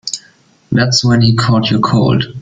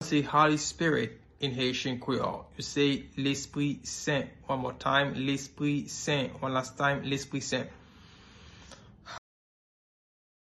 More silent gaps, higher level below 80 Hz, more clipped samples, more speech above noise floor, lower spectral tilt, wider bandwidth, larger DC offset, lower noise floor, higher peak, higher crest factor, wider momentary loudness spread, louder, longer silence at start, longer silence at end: neither; first, -40 dBFS vs -60 dBFS; neither; first, 37 dB vs 24 dB; about the same, -5 dB/octave vs -4.5 dB/octave; second, 9.2 kHz vs 12 kHz; neither; second, -48 dBFS vs -54 dBFS; first, 0 dBFS vs -10 dBFS; second, 12 dB vs 22 dB; second, 8 LU vs 11 LU; first, -12 LUFS vs -30 LUFS; about the same, 0.05 s vs 0 s; second, 0 s vs 1.3 s